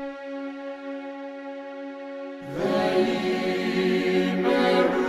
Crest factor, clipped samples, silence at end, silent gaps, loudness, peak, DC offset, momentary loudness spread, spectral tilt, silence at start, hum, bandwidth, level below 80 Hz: 18 dB; under 0.1%; 0 s; none; -25 LUFS; -8 dBFS; under 0.1%; 15 LU; -6 dB/octave; 0 s; none; 13 kHz; -62 dBFS